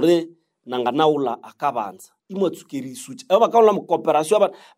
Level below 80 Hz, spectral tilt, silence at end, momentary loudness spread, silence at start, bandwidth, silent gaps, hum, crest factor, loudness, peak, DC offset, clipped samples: -76 dBFS; -5.5 dB/octave; 0.25 s; 17 LU; 0 s; 16 kHz; none; none; 18 dB; -20 LUFS; -2 dBFS; under 0.1%; under 0.1%